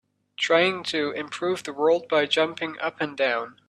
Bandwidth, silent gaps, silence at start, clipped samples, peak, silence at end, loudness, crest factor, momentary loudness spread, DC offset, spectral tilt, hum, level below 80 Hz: 12 kHz; none; 0.4 s; under 0.1%; -8 dBFS; 0.2 s; -24 LUFS; 18 dB; 8 LU; under 0.1%; -3.5 dB/octave; 50 Hz at -55 dBFS; -74 dBFS